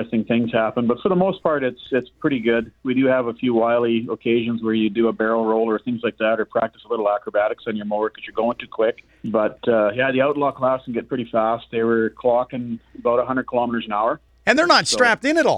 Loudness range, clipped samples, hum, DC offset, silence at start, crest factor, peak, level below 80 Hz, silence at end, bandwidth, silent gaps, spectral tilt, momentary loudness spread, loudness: 3 LU; under 0.1%; none; under 0.1%; 0 s; 20 dB; 0 dBFS; -56 dBFS; 0 s; 11 kHz; none; -5 dB/octave; 7 LU; -20 LUFS